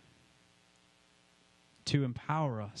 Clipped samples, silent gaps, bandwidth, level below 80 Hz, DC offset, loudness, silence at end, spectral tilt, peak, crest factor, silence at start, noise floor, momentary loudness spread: under 0.1%; none; 10.5 kHz; -66 dBFS; under 0.1%; -34 LUFS; 0 s; -6 dB/octave; -14 dBFS; 24 dB; 1.85 s; -67 dBFS; 4 LU